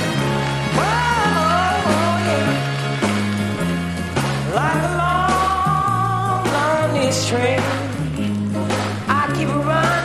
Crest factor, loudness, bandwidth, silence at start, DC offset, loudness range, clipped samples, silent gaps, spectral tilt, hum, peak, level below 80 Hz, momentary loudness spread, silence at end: 14 dB; -19 LUFS; 14 kHz; 0 s; under 0.1%; 2 LU; under 0.1%; none; -5 dB/octave; none; -4 dBFS; -40 dBFS; 5 LU; 0 s